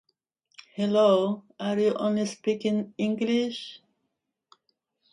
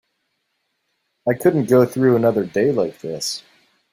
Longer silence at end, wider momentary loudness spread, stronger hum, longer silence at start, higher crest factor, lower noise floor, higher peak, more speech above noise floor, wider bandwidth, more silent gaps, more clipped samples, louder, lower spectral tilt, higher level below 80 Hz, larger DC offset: first, 1.35 s vs 0.5 s; about the same, 11 LU vs 10 LU; neither; second, 0.75 s vs 1.25 s; about the same, 18 dB vs 18 dB; first, -81 dBFS vs -72 dBFS; second, -10 dBFS vs -2 dBFS; about the same, 55 dB vs 55 dB; second, 10.5 kHz vs 16 kHz; neither; neither; second, -26 LUFS vs -18 LUFS; about the same, -6 dB/octave vs -6 dB/octave; second, -76 dBFS vs -60 dBFS; neither